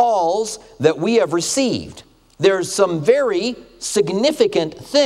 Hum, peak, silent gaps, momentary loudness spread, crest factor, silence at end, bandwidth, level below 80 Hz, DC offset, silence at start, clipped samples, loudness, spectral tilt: none; 0 dBFS; none; 8 LU; 18 dB; 0 s; 14.5 kHz; -54 dBFS; under 0.1%; 0 s; under 0.1%; -18 LUFS; -4 dB/octave